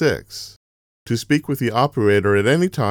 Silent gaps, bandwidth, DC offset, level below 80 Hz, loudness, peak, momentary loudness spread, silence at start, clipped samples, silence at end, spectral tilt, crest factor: 0.56-1.06 s; 19.5 kHz; under 0.1%; -52 dBFS; -19 LUFS; -4 dBFS; 16 LU; 0 s; under 0.1%; 0 s; -6 dB/octave; 16 dB